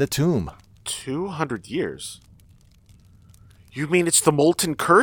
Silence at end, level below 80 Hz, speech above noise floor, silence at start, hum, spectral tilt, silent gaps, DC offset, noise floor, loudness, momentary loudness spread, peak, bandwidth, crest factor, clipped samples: 0 s; -52 dBFS; 32 dB; 0 s; none; -4 dB/octave; none; under 0.1%; -53 dBFS; -22 LUFS; 18 LU; -2 dBFS; over 20 kHz; 22 dB; under 0.1%